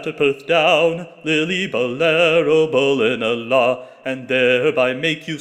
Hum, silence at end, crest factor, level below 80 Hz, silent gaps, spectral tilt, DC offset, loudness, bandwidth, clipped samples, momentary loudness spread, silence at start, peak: none; 0 s; 14 dB; -64 dBFS; none; -5 dB/octave; under 0.1%; -17 LUFS; 9.2 kHz; under 0.1%; 7 LU; 0 s; -2 dBFS